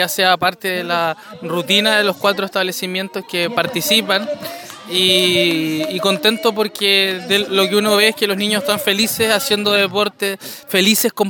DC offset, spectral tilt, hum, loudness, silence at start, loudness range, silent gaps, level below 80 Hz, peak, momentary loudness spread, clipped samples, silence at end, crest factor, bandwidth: under 0.1%; -2.5 dB/octave; none; -15 LUFS; 0 s; 3 LU; none; -62 dBFS; 0 dBFS; 10 LU; under 0.1%; 0 s; 16 dB; 19.5 kHz